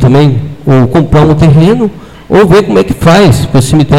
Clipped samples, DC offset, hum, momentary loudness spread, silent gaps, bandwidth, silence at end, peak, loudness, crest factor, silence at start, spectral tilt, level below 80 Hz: 2%; under 0.1%; none; 5 LU; none; 14.5 kHz; 0 s; 0 dBFS; -6 LUFS; 6 dB; 0 s; -7 dB/octave; -24 dBFS